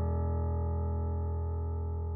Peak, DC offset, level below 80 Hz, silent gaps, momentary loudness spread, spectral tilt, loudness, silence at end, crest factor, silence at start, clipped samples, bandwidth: -22 dBFS; under 0.1%; -36 dBFS; none; 3 LU; -10.5 dB/octave; -34 LUFS; 0 s; 10 dB; 0 s; under 0.1%; 2 kHz